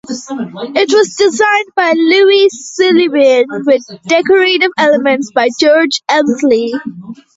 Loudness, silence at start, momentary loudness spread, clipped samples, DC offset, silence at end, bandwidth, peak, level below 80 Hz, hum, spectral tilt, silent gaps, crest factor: -10 LUFS; 0.1 s; 11 LU; under 0.1%; under 0.1%; 0.2 s; 8 kHz; 0 dBFS; -58 dBFS; none; -3 dB/octave; none; 10 dB